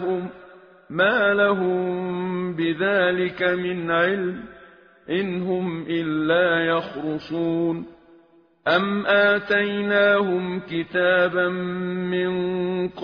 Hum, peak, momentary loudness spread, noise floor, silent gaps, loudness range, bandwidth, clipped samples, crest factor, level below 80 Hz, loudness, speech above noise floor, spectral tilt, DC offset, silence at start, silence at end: none; -4 dBFS; 10 LU; -55 dBFS; none; 4 LU; 5.4 kHz; under 0.1%; 18 dB; -60 dBFS; -22 LUFS; 34 dB; -3.5 dB/octave; under 0.1%; 0 s; 0 s